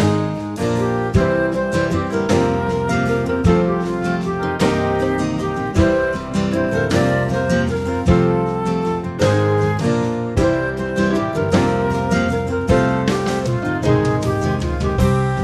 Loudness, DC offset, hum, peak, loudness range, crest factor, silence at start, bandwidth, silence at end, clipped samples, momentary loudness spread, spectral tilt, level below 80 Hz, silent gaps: -18 LUFS; under 0.1%; none; -2 dBFS; 1 LU; 16 dB; 0 s; 13.5 kHz; 0 s; under 0.1%; 4 LU; -7 dB/octave; -32 dBFS; none